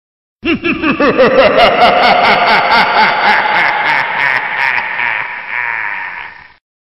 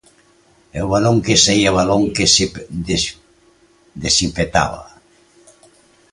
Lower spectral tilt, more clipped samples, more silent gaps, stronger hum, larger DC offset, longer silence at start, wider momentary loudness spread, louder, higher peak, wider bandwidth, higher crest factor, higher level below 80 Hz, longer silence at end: first, -5 dB/octave vs -3.5 dB/octave; neither; neither; neither; first, 0.3% vs under 0.1%; second, 0.45 s vs 0.75 s; second, 11 LU vs 14 LU; first, -10 LUFS vs -15 LUFS; about the same, 0 dBFS vs 0 dBFS; first, 14.5 kHz vs 11.5 kHz; second, 12 dB vs 18 dB; second, -44 dBFS vs -38 dBFS; second, 0.65 s vs 1.3 s